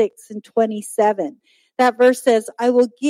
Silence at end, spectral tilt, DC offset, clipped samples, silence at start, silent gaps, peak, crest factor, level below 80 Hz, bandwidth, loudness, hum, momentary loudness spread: 0 s; -4 dB/octave; under 0.1%; under 0.1%; 0 s; none; -4 dBFS; 14 dB; -76 dBFS; 16 kHz; -18 LUFS; none; 13 LU